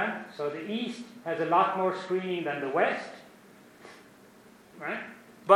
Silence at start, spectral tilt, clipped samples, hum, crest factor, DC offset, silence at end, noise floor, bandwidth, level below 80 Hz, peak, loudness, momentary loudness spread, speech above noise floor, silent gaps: 0 s; -5.5 dB/octave; under 0.1%; none; 24 dB; under 0.1%; 0 s; -55 dBFS; 15.5 kHz; -80 dBFS; -6 dBFS; -30 LUFS; 23 LU; 25 dB; none